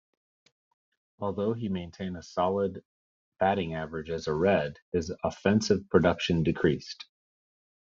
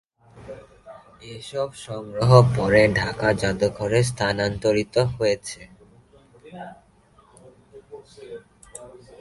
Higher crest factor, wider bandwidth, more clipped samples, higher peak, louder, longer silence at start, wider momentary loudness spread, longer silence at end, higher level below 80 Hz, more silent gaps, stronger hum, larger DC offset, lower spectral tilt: about the same, 24 dB vs 24 dB; second, 7.6 kHz vs 11.5 kHz; neither; second, -6 dBFS vs 0 dBFS; second, -29 LUFS vs -21 LUFS; first, 1.2 s vs 0.35 s; second, 12 LU vs 25 LU; first, 0.9 s vs 0.35 s; second, -58 dBFS vs -48 dBFS; first, 2.85-3.32 s, 4.82-4.92 s vs none; neither; neither; about the same, -5.5 dB/octave vs -6 dB/octave